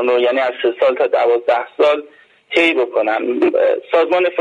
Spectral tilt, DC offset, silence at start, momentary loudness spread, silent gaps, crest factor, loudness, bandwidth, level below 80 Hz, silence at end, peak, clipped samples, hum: -4 dB/octave; under 0.1%; 0 s; 4 LU; none; 14 dB; -15 LUFS; 9 kHz; -64 dBFS; 0 s; -2 dBFS; under 0.1%; none